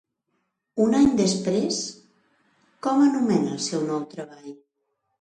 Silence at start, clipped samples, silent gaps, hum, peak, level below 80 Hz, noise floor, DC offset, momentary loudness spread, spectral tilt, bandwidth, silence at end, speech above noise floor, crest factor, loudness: 0.75 s; under 0.1%; none; none; -8 dBFS; -58 dBFS; -76 dBFS; under 0.1%; 18 LU; -5 dB/octave; 10 kHz; 0.65 s; 54 dB; 18 dB; -23 LUFS